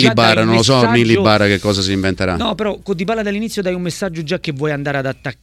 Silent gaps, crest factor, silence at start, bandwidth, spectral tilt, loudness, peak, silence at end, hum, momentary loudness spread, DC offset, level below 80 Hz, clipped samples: none; 16 dB; 0 s; 15 kHz; -5 dB/octave; -15 LUFS; 0 dBFS; 0.1 s; none; 10 LU; under 0.1%; -42 dBFS; under 0.1%